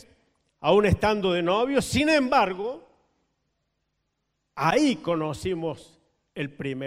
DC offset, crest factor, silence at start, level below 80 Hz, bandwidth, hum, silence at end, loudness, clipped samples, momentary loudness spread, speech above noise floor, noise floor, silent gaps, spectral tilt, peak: under 0.1%; 20 dB; 0.6 s; -48 dBFS; 16 kHz; none; 0 s; -24 LUFS; under 0.1%; 14 LU; 54 dB; -77 dBFS; none; -5.5 dB/octave; -6 dBFS